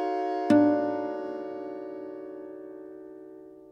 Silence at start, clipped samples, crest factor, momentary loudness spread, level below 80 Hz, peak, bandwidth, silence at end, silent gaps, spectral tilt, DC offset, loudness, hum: 0 s; under 0.1%; 20 dB; 24 LU; -76 dBFS; -10 dBFS; 9 kHz; 0 s; none; -7.5 dB/octave; under 0.1%; -28 LUFS; none